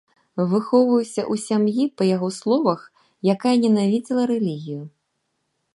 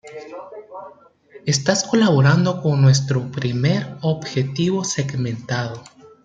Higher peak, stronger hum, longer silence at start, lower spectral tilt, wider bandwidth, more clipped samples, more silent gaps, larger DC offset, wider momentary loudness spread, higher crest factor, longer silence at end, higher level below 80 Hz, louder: about the same, -4 dBFS vs -2 dBFS; neither; first, 0.35 s vs 0.05 s; about the same, -6.5 dB/octave vs -5.5 dB/octave; first, 11.5 kHz vs 9.2 kHz; neither; neither; neither; second, 10 LU vs 21 LU; about the same, 18 dB vs 18 dB; first, 0.85 s vs 0.35 s; second, -72 dBFS vs -58 dBFS; about the same, -21 LUFS vs -19 LUFS